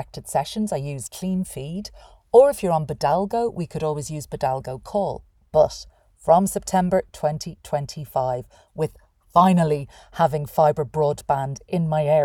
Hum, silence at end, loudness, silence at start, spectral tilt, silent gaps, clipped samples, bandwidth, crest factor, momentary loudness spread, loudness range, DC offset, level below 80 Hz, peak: none; 0 s; -22 LUFS; 0 s; -6.5 dB/octave; none; under 0.1%; 18.5 kHz; 20 dB; 14 LU; 2 LU; under 0.1%; -50 dBFS; -2 dBFS